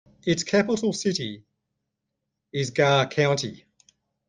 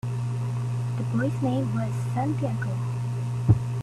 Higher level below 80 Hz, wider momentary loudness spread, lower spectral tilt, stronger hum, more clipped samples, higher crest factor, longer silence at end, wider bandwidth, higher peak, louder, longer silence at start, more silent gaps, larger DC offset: second, -64 dBFS vs -48 dBFS; first, 14 LU vs 6 LU; second, -4.5 dB/octave vs -8 dB/octave; neither; neither; about the same, 20 dB vs 18 dB; first, 0.7 s vs 0 s; second, 9.8 kHz vs 11 kHz; about the same, -6 dBFS vs -8 dBFS; first, -24 LUFS vs -27 LUFS; first, 0.25 s vs 0.05 s; neither; neither